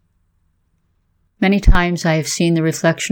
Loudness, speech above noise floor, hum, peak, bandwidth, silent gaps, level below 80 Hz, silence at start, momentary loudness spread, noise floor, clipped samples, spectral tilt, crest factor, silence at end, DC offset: -16 LUFS; 49 dB; none; 0 dBFS; 17 kHz; none; -22 dBFS; 1.4 s; 3 LU; -63 dBFS; under 0.1%; -5 dB/octave; 16 dB; 0 s; under 0.1%